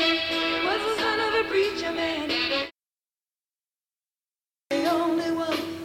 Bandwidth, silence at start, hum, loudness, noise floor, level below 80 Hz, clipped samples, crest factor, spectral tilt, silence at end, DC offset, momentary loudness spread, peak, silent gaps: 16.5 kHz; 0 s; none; -25 LUFS; under -90 dBFS; -60 dBFS; under 0.1%; 18 dB; -3.5 dB/octave; 0 s; under 0.1%; 5 LU; -10 dBFS; none